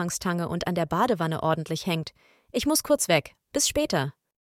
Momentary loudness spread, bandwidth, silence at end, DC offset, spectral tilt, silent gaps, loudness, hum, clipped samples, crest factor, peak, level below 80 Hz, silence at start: 8 LU; 17 kHz; 0.35 s; under 0.1%; -4 dB/octave; none; -26 LUFS; none; under 0.1%; 20 dB; -6 dBFS; -54 dBFS; 0 s